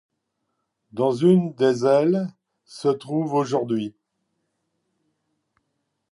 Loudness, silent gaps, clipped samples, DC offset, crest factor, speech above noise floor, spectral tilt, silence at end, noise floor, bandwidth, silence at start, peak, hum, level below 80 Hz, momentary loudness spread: -22 LUFS; none; under 0.1%; under 0.1%; 18 dB; 56 dB; -7.5 dB/octave; 2.2 s; -77 dBFS; 11.5 kHz; 0.95 s; -6 dBFS; none; -72 dBFS; 9 LU